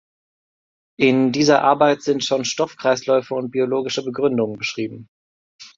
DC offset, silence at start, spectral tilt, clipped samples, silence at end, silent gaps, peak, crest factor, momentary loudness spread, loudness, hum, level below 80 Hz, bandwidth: under 0.1%; 1 s; -4.5 dB/octave; under 0.1%; 0.1 s; 5.08-5.59 s; -2 dBFS; 18 dB; 9 LU; -19 LUFS; none; -64 dBFS; 7.8 kHz